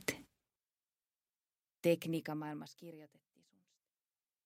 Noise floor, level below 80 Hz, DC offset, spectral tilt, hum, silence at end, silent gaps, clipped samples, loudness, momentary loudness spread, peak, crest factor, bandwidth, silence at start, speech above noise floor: under -90 dBFS; -82 dBFS; under 0.1%; -5 dB/octave; none; 1.4 s; none; under 0.1%; -39 LUFS; 20 LU; -14 dBFS; 30 dB; 16 kHz; 0 s; over 51 dB